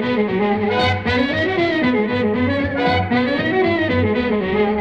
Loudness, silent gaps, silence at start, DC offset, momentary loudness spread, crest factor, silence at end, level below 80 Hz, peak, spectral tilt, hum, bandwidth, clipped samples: -18 LUFS; none; 0 s; under 0.1%; 2 LU; 12 dB; 0 s; -42 dBFS; -6 dBFS; -7.5 dB/octave; none; 8.4 kHz; under 0.1%